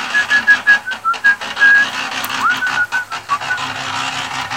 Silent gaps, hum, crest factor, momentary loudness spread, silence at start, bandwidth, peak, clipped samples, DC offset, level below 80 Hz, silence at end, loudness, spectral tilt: none; none; 16 dB; 10 LU; 0 s; 17 kHz; 0 dBFS; under 0.1%; 0.2%; -56 dBFS; 0 s; -14 LUFS; -1 dB/octave